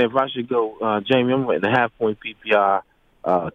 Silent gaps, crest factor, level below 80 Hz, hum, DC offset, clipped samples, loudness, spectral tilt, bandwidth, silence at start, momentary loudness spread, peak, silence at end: none; 16 dB; -60 dBFS; none; under 0.1%; under 0.1%; -21 LUFS; -7.5 dB/octave; 7 kHz; 0 s; 6 LU; -4 dBFS; 0.05 s